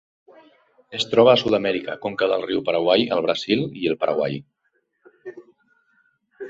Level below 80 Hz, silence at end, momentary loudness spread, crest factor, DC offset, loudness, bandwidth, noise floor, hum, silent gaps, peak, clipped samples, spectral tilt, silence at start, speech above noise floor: -62 dBFS; 0 s; 19 LU; 20 dB; under 0.1%; -21 LUFS; 8 kHz; -70 dBFS; none; none; -2 dBFS; under 0.1%; -5.5 dB/octave; 0.9 s; 50 dB